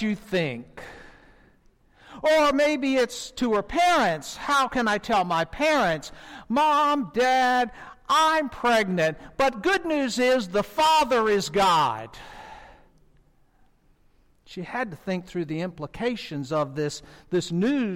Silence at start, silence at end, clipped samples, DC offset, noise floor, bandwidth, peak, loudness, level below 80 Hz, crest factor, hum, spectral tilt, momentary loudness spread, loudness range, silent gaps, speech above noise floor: 0 s; 0 s; under 0.1%; under 0.1%; -60 dBFS; 16.5 kHz; -14 dBFS; -24 LUFS; -52 dBFS; 10 dB; none; -4.5 dB/octave; 16 LU; 10 LU; none; 36 dB